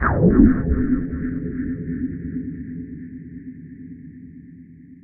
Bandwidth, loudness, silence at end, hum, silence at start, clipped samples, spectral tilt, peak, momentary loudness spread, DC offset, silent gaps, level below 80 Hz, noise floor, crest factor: 2.5 kHz; -21 LUFS; 0.1 s; none; 0 s; under 0.1%; -13 dB/octave; 0 dBFS; 24 LU; under 0.1%; none; -30 dBFS; -43 dBFS; 22 dB